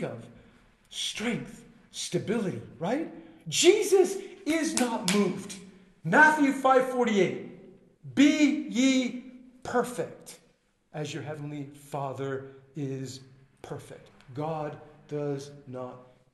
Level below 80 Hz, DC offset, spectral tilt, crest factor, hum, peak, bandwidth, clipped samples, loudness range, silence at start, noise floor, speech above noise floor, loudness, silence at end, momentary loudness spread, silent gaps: -68 dBFS; under 0.1%; -4 dB/octave; 24 dB; none; -6 dBFS; 12.5 kHz; under 0.1%; 13 LU; 0 s; -67 dBFS; 39 dB; -27 LUFS; 0.3 s; 21 LU; none